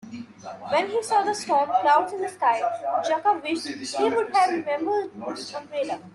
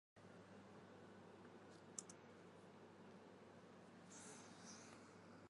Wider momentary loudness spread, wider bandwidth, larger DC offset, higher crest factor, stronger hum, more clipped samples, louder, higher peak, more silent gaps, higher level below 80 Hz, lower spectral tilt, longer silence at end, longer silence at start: first, 12 LU vs 8 LU; about the same, 12 kHz vs 11.5 kHz; neither; second, 16 dB vs 30 dB; neither; neither; first, -24 LUFS vs -61 LUFS; first, -8 dBFS vs -32 dBFS; neither; first, -74 dBFS vs -90 dBFS; about the same, -3 dB/octave vs -3.5 dB/octave; about the same, 0.05 s vs 0 s; about the same, 0.05 s vs 0.15 s